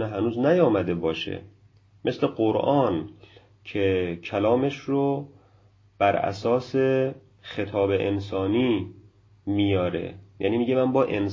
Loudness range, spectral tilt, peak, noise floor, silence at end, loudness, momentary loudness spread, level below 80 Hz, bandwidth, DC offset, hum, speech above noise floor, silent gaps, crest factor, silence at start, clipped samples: 2 LU; -8 dB/octave; -6 dBFS; -58 dBFS; 0 s; -25 LUFS; 12 LU; -50 dBFS; 7.4 kHz; under 0.1%; none; 34 dB; none; 18 dB; 0 s; under 0.1%